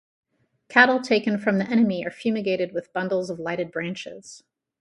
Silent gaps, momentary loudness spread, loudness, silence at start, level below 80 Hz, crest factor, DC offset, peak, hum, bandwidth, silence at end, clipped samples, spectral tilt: none; 13 LU; -23 LUFS; 0.7 s; -68 dBFS; 22 dB; under 0.1%; -2 dBFS; none; 11 kHz; 0.45 s; under 0.1%; -5.5 dB/octave